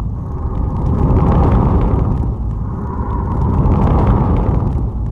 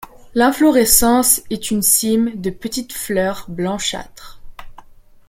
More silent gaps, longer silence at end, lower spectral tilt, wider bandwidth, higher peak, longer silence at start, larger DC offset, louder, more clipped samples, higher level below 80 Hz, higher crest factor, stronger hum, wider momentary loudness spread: neither; second, 0 s vs 0.45 s; first, -11 dB/octave vs -3 dB/octave; second, 4 kHz vs 17 kHz; about the same, 0 dBFS vs 0 dBFS; about the same, 0 s vs 0 s; first, 0.2% vs under 0.1%; about the same, -16 LUFS vs -16 LUFS; neither; first, -18 dBFS vs -40 dBFS; about the same, 14 dB vs 18 dB; neither; second, 9 LU vs 13 LU